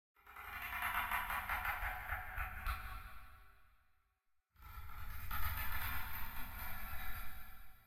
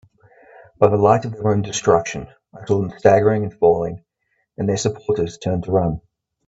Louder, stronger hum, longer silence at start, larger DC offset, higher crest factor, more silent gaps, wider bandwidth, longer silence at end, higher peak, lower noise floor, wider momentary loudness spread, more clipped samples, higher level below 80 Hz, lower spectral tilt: second, -43 LUFS vs -19 LUFS; neither; second, 0.15 s vs 0.8 s; neither; about the same, 16 dB vs 18 dB; neither; first, 16.5 kHz vs 8 kHz; second, 0 s vs 0.5 s; second, -24 dBFS vs 0 dBFS; first, -80 dBFS vs -70 dBFS; first, 17 LU vs 14 LU; neither; about the same, -50 dBFS vs -48 dBFS; second, -3 dB/octave vs -6 dB/octave